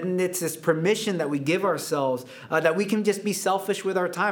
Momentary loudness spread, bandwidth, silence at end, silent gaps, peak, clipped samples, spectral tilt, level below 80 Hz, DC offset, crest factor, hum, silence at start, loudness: 3 LU; over 20 kHz; 0 s; none; -6 dBFS; under 0.1%; -4.5 dB/octave; -80 dBFS; under 0.1%; 18 dB; none; 0 s; -25 LUFS